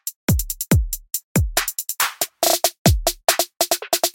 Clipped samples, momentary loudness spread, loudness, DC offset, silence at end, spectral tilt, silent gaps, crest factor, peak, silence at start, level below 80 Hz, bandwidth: under 0.1%; 5 LU; -20 LUFS; under 0.1%; 0.05 s; -3.5 dB/octave; 0.16-0.28 s, 1.24-1.35 s, 2.78-2.85 s; 20 dB; 0 dBFS; 0.05 s; -30 dBFS; 17 kHz